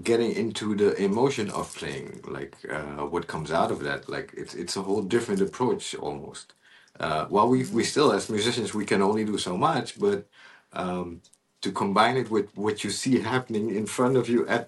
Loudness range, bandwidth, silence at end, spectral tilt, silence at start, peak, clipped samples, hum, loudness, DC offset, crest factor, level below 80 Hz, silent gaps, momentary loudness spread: 5 LU; 12.5 kHz; 0 s; -5 dB/octave; 0 s; -6 dBFS; under 0.1%; none; -26 LUFS; under 0.1%; 20 dB; -60 dBFS; none; 12 LU